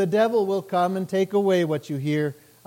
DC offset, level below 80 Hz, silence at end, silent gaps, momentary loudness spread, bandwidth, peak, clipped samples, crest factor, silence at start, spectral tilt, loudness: under 0.1%; -74 dBFS; 0.35 s; none; 6 LU; 17 kHz; -10 dBFS; under 0.1%; 14 dB; 0 s; -7 dB/octave; -23 LUFS